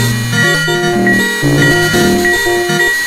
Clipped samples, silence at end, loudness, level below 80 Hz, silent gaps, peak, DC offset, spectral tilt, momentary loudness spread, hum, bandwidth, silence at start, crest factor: under 0.1%; 0 s; -10 LUFS; -34 dBFS; none; 0 dBFS; under 0.1%; -4 dB/octave; 3 LU; none; 16 kHz; 0 s; 12 dB